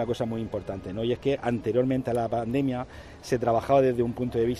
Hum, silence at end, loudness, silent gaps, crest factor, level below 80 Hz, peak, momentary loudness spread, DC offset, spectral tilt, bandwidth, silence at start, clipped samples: none; 0 s; -27 LUFS; none; 18 dB; -50 dBFS; -10 dBFS; 11 LU; under 0.1%; -7.5 dB/octave; 13.5 kHz; 0 s; under 0.1%